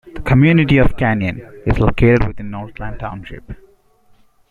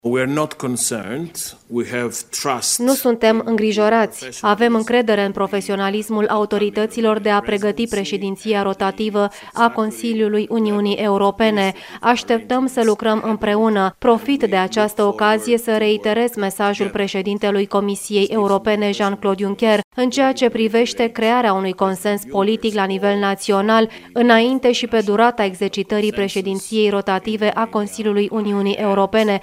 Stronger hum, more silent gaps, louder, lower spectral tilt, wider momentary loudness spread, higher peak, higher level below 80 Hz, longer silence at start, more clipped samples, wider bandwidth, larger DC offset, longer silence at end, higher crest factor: neither; second, none vs 19.84-19.91 s; first, -15 LUFS vs -18 LUFS; first, -9 dB/octave vs -4.5 dB/octave; first, 18 LU vs 6 LU; about the same, 0 dBFS vs 0 dBFS; first, -28 dBFS vs -54 dBFS; about the same, 0.05 s vs 0.05 s; neither; second, 7 kHz vs 16 kHz; neither; first, 0.95 s vs 0 s; about the same, 16 dB vs 18 dB